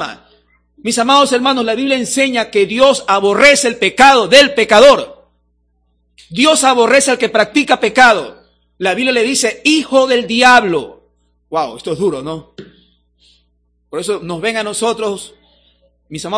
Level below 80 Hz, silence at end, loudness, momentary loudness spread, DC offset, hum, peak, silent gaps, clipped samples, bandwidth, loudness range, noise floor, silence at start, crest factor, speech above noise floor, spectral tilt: -48 dBFS; 0 s; -11 LUFS; 16 LU; under 0.1%; 60 Hz at -45 dBFS; 0 dBFS; none; 1%; 11 kHz; 12 LU; -60 dBFS; 0 s; 14 dB; 48 dB; -2.5 dB/octave